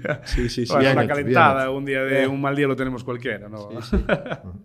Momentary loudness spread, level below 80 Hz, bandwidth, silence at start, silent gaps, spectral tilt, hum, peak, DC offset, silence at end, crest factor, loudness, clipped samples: 13 LU; -34 dBFS; 14.5 kHz; 0 s; none; -6.5 dB/octave; none; 0 dBFS; under 0.1%; 0.05 s; 20 dB; -21 LUFS; under 0.1%